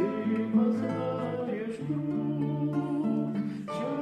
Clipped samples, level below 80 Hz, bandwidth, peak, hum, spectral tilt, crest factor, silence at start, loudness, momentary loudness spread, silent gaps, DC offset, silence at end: under 0.1%; -70 dBFS; 9.4 kHz; -16 dBFS; none; -9 dB/octave; 14 dB; 0 s; -30 LUFS; 7 LU; none; under 0.1%; 0 s